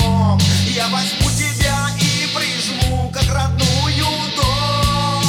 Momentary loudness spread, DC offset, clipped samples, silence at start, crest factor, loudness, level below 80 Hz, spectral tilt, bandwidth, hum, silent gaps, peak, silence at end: 3 LU; under 0.1%; under 0.1%; 0 s; 14 dB; -16 LUFS; -28 dBFS; -4 dB/octave; 17.5 kHz; none; none; -4 dBFS; 0 s